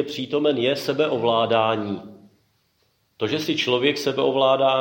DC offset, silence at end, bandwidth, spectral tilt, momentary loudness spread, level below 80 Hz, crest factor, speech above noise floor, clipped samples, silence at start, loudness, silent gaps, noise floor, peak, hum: under 0.1%; 0 s; 17 kHz; -5 dB/octave; 8 LU; -70 dBFS; 16 dB; 46 dB; under 0.1%; 0 s; -21 LUFS; none; -67 dBFS; -6 dBFS; none